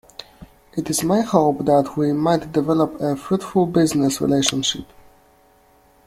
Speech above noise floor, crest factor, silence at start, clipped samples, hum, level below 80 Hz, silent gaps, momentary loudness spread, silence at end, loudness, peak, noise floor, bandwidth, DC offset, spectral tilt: 36 dB; 18 dB; 0.2 s; under 0.1%; none; -52 dBFS; none; 9 LU; 1.2 s; -19 LUFS; -2 dBFS; -55 dBFS; 16 kHz; under 0.1%; -5 dB/octave